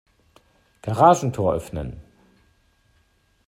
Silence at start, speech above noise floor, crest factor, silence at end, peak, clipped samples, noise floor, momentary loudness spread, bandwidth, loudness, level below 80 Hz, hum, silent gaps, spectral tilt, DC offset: 0.85 s; 44 dB; 22 dB; 1.45 s; -2 dBFS; under 0.1%; -63 dBFS; 20 LU; 15 kHz; -20 LUFS; -48 dBFS; none; none; -6.5 dB/octave; under 0.1%